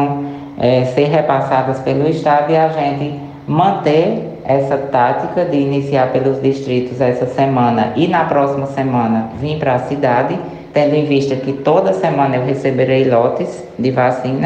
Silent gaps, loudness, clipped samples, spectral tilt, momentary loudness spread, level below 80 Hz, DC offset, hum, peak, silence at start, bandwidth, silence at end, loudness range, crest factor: none; -15 LUFS; under 0.1%; -8 dB/octave; 6 LU; -50 dBFS; under 0.1%; none; -2 dBFS; 0 s; 8.8 kHz; 0 s; 1 LU; 14 dB